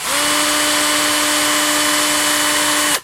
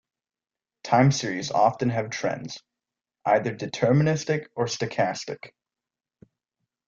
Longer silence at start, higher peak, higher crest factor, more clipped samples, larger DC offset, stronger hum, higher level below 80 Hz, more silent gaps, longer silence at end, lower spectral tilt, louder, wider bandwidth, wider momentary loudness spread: second, 0 s vs 0.85 s; first, -2 dBFS vs -6 dBFS; second, 14 dB vs 20 dB; neither; neither; neither; first, -50 dBFS vs -64 dBFS; neither; second, 0 s vs 1.4 s; second, 0 dB/octave vs -5.5 dB/octave; first, -14 LUFS vs -25 LUFS; first, 16 kHz vs 7.6 kHz; second, 0 LU vs 15 LU